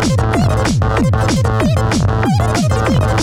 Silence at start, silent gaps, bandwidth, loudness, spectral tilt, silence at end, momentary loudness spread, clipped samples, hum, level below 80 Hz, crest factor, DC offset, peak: 0 s; none; 14 kHz; -14 LUFS; -6 dB/octave; 0 s; 1 LU; under 0.1%; none; -24 dBFS; 8 dB; under 0.1%; -6 dBFS